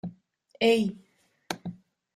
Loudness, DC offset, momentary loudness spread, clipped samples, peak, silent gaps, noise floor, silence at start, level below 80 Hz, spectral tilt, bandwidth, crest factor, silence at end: -28 LUFS; under 0.1%; 19 LU; under 0.1%; -10 dBFS; none; -59 dBFS; 0.05 s; -68 dBFS; -5 dB/octave; 14.5 kHz; 20 dB; 0.4 s